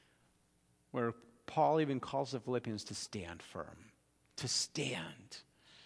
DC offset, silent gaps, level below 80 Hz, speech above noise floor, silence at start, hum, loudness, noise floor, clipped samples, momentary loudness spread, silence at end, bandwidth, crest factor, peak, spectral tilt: under 0.1%; none; -72 dBFS; 35 dB; 0.95 s; none; -38 LUFS; -73 dBFS; under 0.1%; 19 LU; 0 s; 11 kHz; 20 dB; -20 dBFS; -4 dB/octave